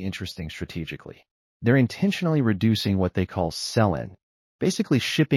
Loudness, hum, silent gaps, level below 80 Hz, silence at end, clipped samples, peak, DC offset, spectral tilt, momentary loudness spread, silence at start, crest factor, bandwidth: -24 LUFS; none; 1.31-1.60 s, 4.23-4.59 s; -50 dBFS; 0 s; under 0.1%; -6 dBFS; under 0.1%; -6 dB/octave; 12 LU; 0 s; 18 dB; 15 kHz